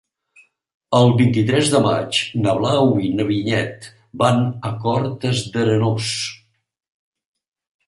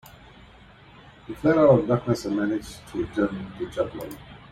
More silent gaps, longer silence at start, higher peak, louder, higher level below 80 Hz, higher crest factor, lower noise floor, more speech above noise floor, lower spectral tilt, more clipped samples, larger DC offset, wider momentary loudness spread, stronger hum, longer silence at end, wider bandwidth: neither; second, 0.9 s vs 1.3 s; first, -2 dBFS vs -6 dBFS; first, -18 LUFS vs -24 LUFS; about the same, -54 dBFS vs -52 dBFS; about the same, 18 dB vs 20 dB; first, -55 dBFS vs -50 dBFS; first, 37 dB vs 26 dB; second, -5.5 dB/octave vs -7.5 dB/octave; neither; neither; second, 8 LU vs 19 LU; neither; first, 1.5 s vs 0.15 s; second, 11.5 kHz vs 16 kHz